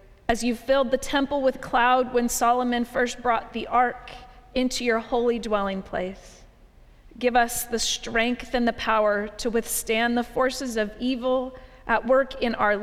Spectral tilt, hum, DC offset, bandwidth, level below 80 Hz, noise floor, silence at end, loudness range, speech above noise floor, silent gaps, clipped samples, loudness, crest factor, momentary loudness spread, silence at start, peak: -3 dB/octave; none; under 0.1%; 16 kHz; -46 dBFS; -52 dBFS; 0 s; 3 LU; 28 dB; none; under 0.1%; -24 LUFS; 16 dB; 7 LU; 0.3 s; -8 dBFS